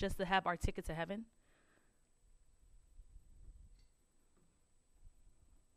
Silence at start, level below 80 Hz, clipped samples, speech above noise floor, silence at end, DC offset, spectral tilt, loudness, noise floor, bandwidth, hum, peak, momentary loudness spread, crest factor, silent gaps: 0 s; -54 dBFS; under 0.1%; 33 dB; 0.45 s; under 0.1%; -5 dB/octave; -39 LUFS; -72 dBFS; 13 kHz; none; -18 dBFS; 12 LU; 26 dB; none